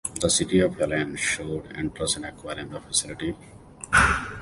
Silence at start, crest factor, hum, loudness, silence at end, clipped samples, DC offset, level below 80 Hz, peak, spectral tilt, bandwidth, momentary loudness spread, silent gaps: 0.05 s; 20 dB; none; -24 LUFS; 0 s; under 0.1%; under 0.1%; -42 dBFS; -6 dBFS; -3 dB/octave; 11.5 kHz; 15 LU; none